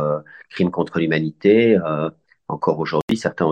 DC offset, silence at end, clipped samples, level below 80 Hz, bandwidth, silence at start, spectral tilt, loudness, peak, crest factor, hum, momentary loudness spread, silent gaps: under 0.1%; 0 s; under 0.1%; -58 dBFS; 9.6 kHz; 0 s; -7 dB/octave; -20 LUFS; -2 dBFS; 16 dB; none; 13 LU; 3.02-3.08 s